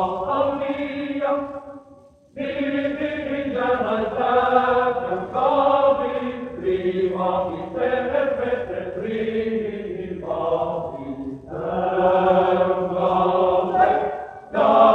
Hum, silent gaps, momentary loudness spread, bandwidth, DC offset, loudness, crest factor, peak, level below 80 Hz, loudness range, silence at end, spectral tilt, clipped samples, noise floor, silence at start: none; none; 12 LU; 6.2 kHz; under 0.1%; -22 LUFS; 18 dB; -2 dBFS; -52 dBFS; 6 LU; 0 s; -8 dB/octave; under 0.1%; -49 dBFS; 0 s